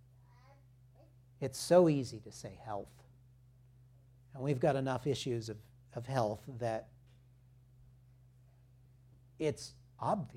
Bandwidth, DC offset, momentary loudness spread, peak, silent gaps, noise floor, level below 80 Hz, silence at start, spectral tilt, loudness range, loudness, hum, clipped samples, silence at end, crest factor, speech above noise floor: 15.5 kHz; under 0.1%; 20 LU; -14 dBFS; none; -63 dBFS; -68 dBFS; 1.4 s; -6 dB/octave; 9 LU; -35 LUFS; none; under 0.1%; 0 s; 24 dB; 28 dB